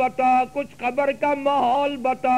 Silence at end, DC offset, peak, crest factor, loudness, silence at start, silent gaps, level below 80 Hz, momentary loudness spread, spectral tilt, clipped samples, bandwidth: 0 s; 0.3%; -10 dBFS; 10 dB; -22 LUFS; 0 s; none; -58 dBFS; 6 LU; -5 dB/octave; under 0.1%; 12.5 kHz